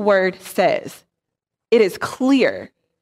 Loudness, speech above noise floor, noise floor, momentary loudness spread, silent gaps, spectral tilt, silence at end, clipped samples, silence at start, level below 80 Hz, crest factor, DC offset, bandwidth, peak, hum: -18 LUFS; 65 dB; -83 dBFS; 9 LU; none; -5 dB/octave; 0.35 s; under 0.1%; 0 s; -66 dBFS; 16 dB; under 0.1%; 15.5 kHz; -4 dBFS; none